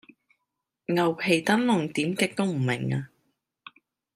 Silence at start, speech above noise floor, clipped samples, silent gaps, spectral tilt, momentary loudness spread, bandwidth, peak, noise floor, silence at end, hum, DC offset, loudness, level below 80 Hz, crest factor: 0.9 s; 58 dB; under 0.1%; none; -5.5 dB/octave; 9 LU; 15.5 kHz; -8 dBFS; -83 dBFS; 1.1 s; none; under 0.1%; -25 LUFS; -70 dBFS; 20 dB